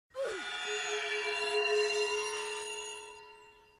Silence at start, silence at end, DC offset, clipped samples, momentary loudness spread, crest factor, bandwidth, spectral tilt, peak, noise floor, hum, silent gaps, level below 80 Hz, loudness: 0.15 s; 0.25 s; under 0.1%; under 0.1%; 15 LU; 16 dB; 14.5 kHz; 0.5 dB/octave; -20 dBFS; -58 dBFS; none; none; -74 dBFS; -33 LUFS